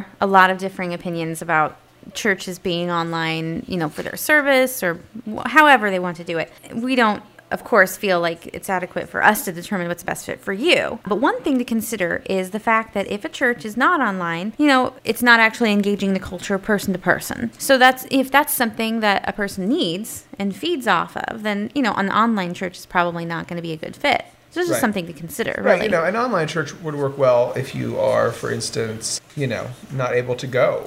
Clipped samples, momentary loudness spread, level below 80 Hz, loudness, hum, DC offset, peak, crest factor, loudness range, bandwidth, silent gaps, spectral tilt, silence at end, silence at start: under 0.1%; 12 LU; -54 dBFS; -20 LUFS; none; under 0.1%; 0 dBFS; 20 dB; 4 LU; 16 kHz; none; -4.5 dB/octave; 0 s; 0 s